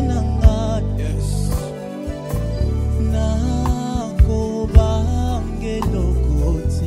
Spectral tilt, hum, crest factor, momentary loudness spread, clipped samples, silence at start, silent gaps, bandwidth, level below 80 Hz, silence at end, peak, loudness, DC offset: -7.5 dB/octave; none; 18 dB; 8 LU; under 0.1%; 0 s; none; 15 kHz; -20 dBFS; 0 s; 0 dBFS; -20 LUFS; under 0.1%